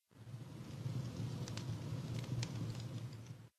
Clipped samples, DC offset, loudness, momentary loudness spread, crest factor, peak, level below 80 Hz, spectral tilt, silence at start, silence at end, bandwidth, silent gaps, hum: under 0.1%; under 0.1%; -45 LUFS; 9 LU; 20 dB; -26 dBFS; -66 dBFS; -6 dB/octave; 0.1 s; 0.1 s; 13.5 kHz; none; none